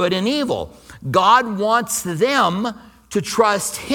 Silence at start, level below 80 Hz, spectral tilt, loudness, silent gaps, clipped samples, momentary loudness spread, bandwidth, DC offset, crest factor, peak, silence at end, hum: 0 s; -52 dBFS; -3.5 dB/octave; -18 LUFS; none; under 0.1%; 12 LU; 19 kHz; under 0.1%; 18 dB; 0 dBFS; 0 s; none